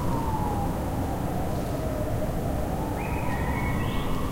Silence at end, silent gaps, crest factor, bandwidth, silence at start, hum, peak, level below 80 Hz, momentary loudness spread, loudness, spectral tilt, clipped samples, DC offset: 0 s; none; 14 dB; 16 kHz; 0 s; none; -14 dBFS; -34 dBFS; 2 LU; -29 LUFS; -6.5 dB/octave; under 0.1%; 0.1%